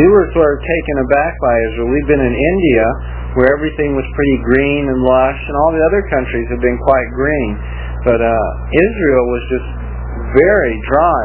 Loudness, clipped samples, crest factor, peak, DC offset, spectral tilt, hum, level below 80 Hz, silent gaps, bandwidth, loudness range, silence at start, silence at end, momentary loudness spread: -14 LUFS; under 0.1%; 12 dB; 0 dBFS; under 0.1%; -11 dB/octave; 60 Hz at -25 dBFS; -24 dBFS; none; 4 kHz; 1 LU; 0 s; 0 s; 8 LU